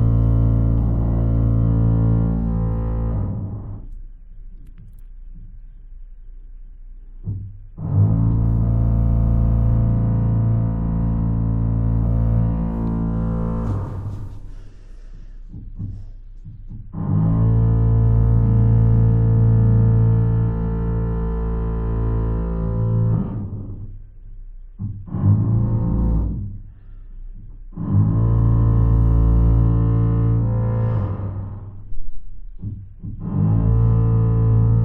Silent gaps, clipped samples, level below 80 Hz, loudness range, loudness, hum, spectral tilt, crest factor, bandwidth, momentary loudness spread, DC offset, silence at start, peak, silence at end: none; under 0.1%; -24 dBFS; 11 LU; -19 LUFS; none; -13 dB/octave; 14 dB; 2.1 kHz; 17 LU; under 0.1%; 0 s; -6 dBFS; 0 s